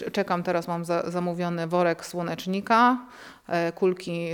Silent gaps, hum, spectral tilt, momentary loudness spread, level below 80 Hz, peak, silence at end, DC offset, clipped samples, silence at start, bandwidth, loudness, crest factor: none; none; -6 dB/octave; 11 LU; -68 dBFS; -8 dBFS; 0 s; under 0.1%; under 0.1%; 0 s; 18 kHz; -26 LUFS; 18 dB